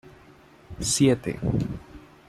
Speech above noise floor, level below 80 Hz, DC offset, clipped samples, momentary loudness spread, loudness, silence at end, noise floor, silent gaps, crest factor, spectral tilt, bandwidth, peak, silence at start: 28 dB; -46 dBFS; under 0.1%; under 0.1%; 17 LU; -25 LUFS; 0.3 s; -52 dBFS; none; 18 dB; -5 dB/octave; 15.5 kHz; -8 dBFS; 0.05 s